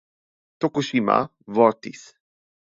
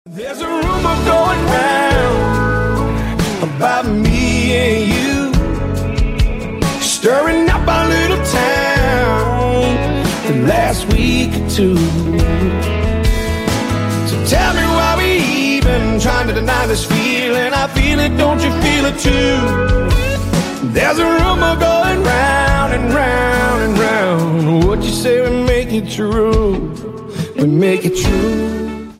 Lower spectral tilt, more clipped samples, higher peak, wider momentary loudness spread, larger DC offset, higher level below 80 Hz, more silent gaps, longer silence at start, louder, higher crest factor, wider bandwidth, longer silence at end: about the same, -6 dB/octave vs -5 dB/octave; neither; about the same, -2 dBFS vs 0 dBFS; first, 13 LU vs 5 LU; neither; second, -68 dBFS vs -22 dBFS; neither; first, 0.6 s vs 0.05 s; second, -22 LUFS vs -14 LUFS; first, 22 dB vs 12 dB; second, 7.8 kHz vs 16 kHz; first, 0.85 s vs 0.05 s